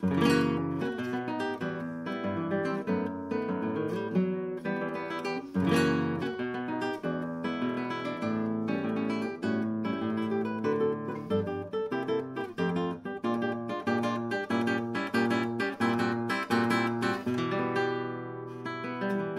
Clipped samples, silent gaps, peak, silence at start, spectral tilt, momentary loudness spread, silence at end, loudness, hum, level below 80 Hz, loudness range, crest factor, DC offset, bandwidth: under 0.1%; none; -12 dBFS; 0 s; -6.5 dB/octave; 6 LU; 0 s; -31 LUFS; none; -70 dBFS; 3 LU; 18 dB; under 0.1%; 13.5 kHz